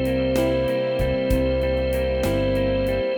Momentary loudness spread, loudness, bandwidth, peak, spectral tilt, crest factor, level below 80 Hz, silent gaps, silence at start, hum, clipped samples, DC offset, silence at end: 2 LU; -22 LUFS; over 20 kHz; -8 dBFS; -6.5 dB/octave; 14 dB; -30 dBFS; none; 0 s; none; under 0.1%; under 0.1%; 0 s